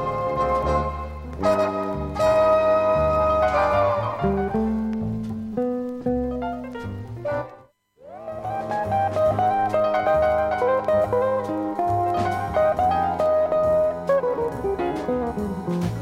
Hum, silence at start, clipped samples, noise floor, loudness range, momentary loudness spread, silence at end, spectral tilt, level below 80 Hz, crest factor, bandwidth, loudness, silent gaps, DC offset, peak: none; 0 s; under 0.1%; -51 dBFS; 8 LU; 10 LU; 0 s; -7.5 dB/octave; -40 dBFS; 14 dB; 13.5 kHz; -22 LUFS; none; under 0.1%; -8 dBFS